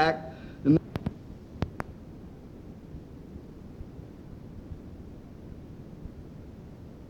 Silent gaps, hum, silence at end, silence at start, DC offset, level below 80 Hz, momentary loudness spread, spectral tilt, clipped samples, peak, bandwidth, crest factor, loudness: none; none; 0 s; 0 s; under 0.1%; -50 dBFS; 20 LU; -8 dB/octave; under 0.1%; -8 dBFS; 10 kHz; 26 dB; -34 LUFS